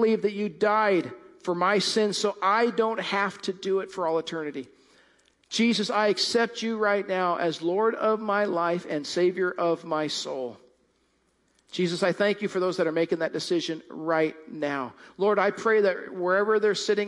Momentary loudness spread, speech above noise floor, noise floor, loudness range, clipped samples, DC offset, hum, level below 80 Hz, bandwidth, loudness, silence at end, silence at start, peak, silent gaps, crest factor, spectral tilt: 9 LU; 43 dB; -69 dBFS; 4 LU; under 0.1%; under 0.1%; none; -78 dBFS; 11.5 kHz; -26 LUFS; 0 s; 0 s; -10 dBFS; none; 16 dB; -4.5 dB/octave